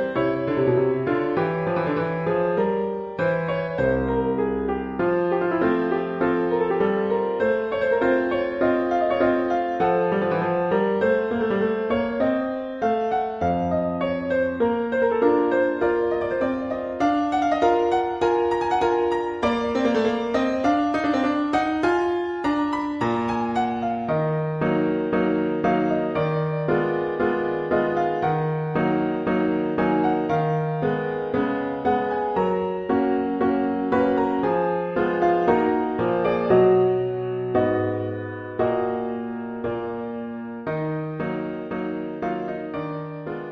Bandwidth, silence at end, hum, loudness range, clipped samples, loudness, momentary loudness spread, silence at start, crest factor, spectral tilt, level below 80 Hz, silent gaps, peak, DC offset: 7.6 kHz; 0 s; none; 2 LU; under 0.1%; -23 LUFS; 7 LU; 0 s; 18 dB; -8 dB/octave; -50 dBFS; none; -6 dBFS; under 0.1%